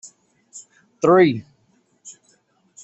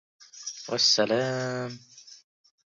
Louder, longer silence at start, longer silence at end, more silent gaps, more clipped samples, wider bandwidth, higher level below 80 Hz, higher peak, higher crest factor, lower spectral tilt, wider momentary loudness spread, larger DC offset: first, -17 LUFS vs -25 LUFS; second, 0.05 s vs 0.35 s; first, 0.75 s vs 0.55 s; neither; neither; about the same, 8.2 kHz vs 7.8 kHz; first, -64 dBFS vs -76 dBFS; first, -2 dBFS vs -10 dBFS; about the same, 20 dB vs 20 dB; first, -6 dB/octave vs -3 dB/octave; first, 28 LU vs 18 LU; neither